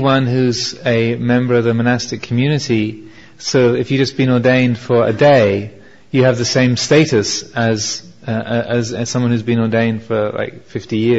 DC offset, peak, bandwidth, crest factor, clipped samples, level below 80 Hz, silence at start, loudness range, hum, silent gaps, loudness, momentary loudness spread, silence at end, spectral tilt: 0.6%; 0 dBFS; 8 kHz; 14 dB; under 0.1%; -50 dBFS; 0 s; 4 LU; none; none; -15 LUFS; 10 LU; 0 s; -5.5 dB/octave